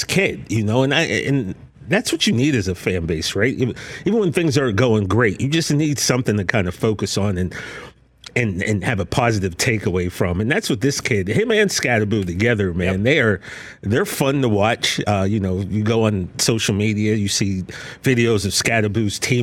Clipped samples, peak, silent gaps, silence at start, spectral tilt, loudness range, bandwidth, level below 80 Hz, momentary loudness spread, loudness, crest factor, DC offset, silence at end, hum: under 0.1%; -2 dBFS; none; 0 s; -5 dB/octave; 3 LU; 17 kHz; -44 dBFS; 6 LU; -19 LUFS; 16 dB; under 0.1%; 0 s; none